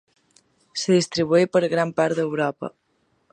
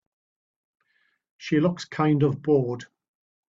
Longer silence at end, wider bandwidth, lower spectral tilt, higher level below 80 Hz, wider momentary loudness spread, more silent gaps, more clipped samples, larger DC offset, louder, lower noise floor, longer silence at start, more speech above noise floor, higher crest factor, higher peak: about the same, 0.65 s vs 0.65 s; first, 10.5 kHz vs 7.8 kHz; second, -5 dB/octave vs -7.5 dB/octave; about the same, -66 dBFS vs -64 dBFS; about the same, 13 LU vs 12 LU; neither; neither; neither; first, -21 LUFS vs -24 LUFS; second, -65 dBFS vs -70 dBFS; second, 0.75 s vs 1.4 s; about the same, 44 dB vs 47 dB; about the same, 18 dB vs 18 dB; first, -6 dBFS vs -10 dBFS